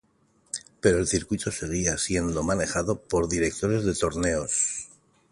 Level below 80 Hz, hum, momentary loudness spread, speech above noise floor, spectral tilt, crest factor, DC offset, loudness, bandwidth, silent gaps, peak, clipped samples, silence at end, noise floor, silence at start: -44 dBFS; none; 8 LU; 39 dB; -4 dB/octave; 22 dB; under 0.1%; -26 LUFS; 11.5 kHz; none; -6 dBFS; under 0.1%; 0.45 s; -65 dBFS; 0.55 s